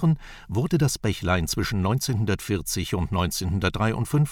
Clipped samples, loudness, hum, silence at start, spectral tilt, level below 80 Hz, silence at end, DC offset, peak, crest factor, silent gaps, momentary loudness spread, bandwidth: under 0.1%; -25 LUFS; none; 0 s; -5.5 dB/octave; -40 dBFS; 0 s; under 0.1%; -8 dBFS; 16 dB; none; 4 LU; 18.5 kHz